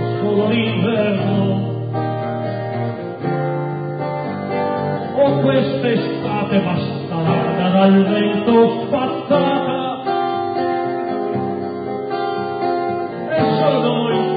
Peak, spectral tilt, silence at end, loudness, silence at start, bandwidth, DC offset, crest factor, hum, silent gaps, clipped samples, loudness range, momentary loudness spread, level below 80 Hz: -2 dBFS; -12.5 dB/octave; 0 s; -18 LUFS; 0 s; 5 kHz; under 0.1%; 16 dB; none; none; under 0.1%; 5 LU; 9 LU; -54 dBFS